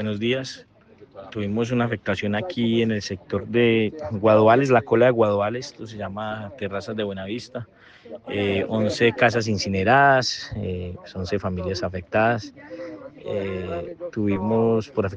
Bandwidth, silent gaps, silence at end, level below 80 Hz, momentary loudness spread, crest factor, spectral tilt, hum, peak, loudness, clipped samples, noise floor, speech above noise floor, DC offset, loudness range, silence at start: 9 kHz; none; 0 s; -56 dBFS; 17 LU; 18 dB; -6 dB/octave; none; -4 dBFS; -22 LUFS; under 0.1%; -49 dBFS; 27 dB; under 0.1%; 7 LU; 0 s